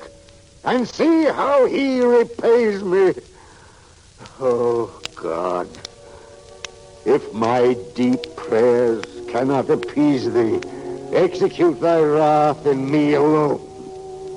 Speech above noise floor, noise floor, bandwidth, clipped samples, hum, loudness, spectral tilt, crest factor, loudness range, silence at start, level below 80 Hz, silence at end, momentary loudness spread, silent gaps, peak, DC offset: 30 dB; -47 dBFS; 11 kHz; under 0.1%; none; -18 LUFS; -6.5 dB/octave; 12 dB; 6 LU; 0 s; -54 dBFS; 0 s; 15 LU; none; -6 dBFS; under 0.1%